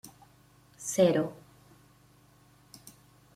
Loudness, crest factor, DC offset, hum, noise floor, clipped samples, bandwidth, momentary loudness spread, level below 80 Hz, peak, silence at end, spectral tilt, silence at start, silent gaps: -28 LUFS; 24 dB; under 0.1%; 50 Hz at -60 dBFS; -61 dBFS; under 0.1%; 16 kHz; 27 LU; -70 dBFS; -10 dBFS; 2 s; -5 dB/octave; 0.05 s; none